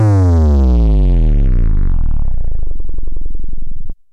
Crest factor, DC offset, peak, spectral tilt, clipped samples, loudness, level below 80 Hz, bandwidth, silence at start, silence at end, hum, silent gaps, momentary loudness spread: 2 dB; under 0.1%; -8 dBFS; -9.5 dB/octave; under 0.1%; -15 LUFS; -12 dBFS; 2.5 kHz; 0 s; 0.2 s; none; none; 18 LU